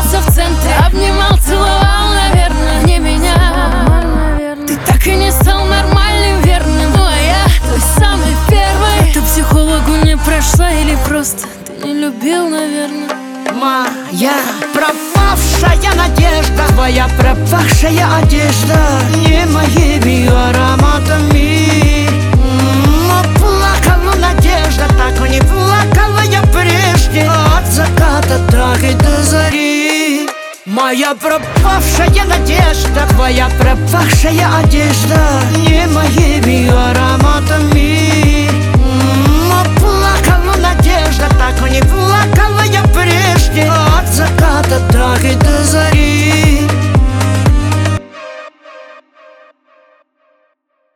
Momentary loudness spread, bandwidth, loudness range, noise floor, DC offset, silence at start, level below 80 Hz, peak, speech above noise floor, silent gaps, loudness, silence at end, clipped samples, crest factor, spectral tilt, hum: 4 LU; 18.5 kHz; 3 LU; -61 dBFS; under 0.1%; 0 s; -14 dBFS; 0 dBFS; 53 dB; none; -10 LUFS; 2.1 s; under 0.1%; 10 dB; -5 dB/octave; none